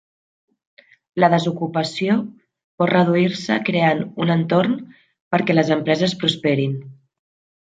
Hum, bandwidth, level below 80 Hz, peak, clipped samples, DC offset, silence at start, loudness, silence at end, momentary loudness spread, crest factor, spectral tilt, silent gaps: none; 9 kHz; -64 dBFS; -2 dBFS; under 0.1%; under 0.1%; 1.15 s; -19 LUFS; 0.85 s; 6 LU; 18 dB; -6.5 dB/octave; 2.64-2.78 s, 5.21-5.31 s